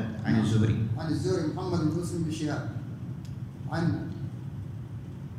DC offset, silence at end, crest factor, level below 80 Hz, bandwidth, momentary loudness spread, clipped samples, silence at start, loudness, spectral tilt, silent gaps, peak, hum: under 0.1%; 0 s; 18 dB; -54 dBFS; 12.5 kHz; 13 LU; under 0.1%; 0 s; -31 LUFS; -7 dB/octave; none; -12 dBFS; none